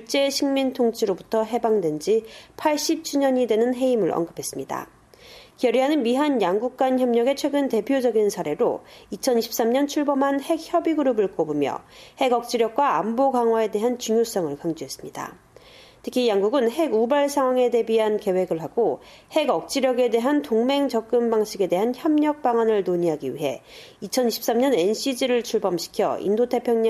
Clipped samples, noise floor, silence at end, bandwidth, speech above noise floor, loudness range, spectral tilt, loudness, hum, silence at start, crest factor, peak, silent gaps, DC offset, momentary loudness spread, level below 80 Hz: under 0.1%; -49 dBFS; 0 s; 14.5 kHz; 27 dB; 2 LU; -4.5 dB/octave; -22 LUFS; none; 0 s; 14 dB; -8 dBFS; none; under 0.1%; 8 LU; -64 dBFS